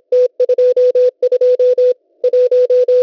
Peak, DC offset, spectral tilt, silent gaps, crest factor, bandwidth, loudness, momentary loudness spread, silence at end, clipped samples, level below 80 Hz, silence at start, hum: -6 dBFS; under 0.1%; -3.5 dB/octave; none; 6 dB; 6 kHz; -13 LUFS; 4 LU; 0 s; under 0.1%; -66 dBFS; 0.1 s; none